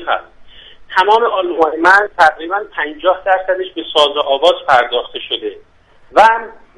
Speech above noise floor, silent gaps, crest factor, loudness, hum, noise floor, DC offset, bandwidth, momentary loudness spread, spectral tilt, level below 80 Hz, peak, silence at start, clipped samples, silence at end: 25 dB; none; 14 dB; -13 LUFS; none; -38 dBFS; under 0.1%; 11.5 kHz; 11 LU; -2.5 dB/octave; -50 dBFS; 0 dBFS; 0 s; 0.1%; 0.25 s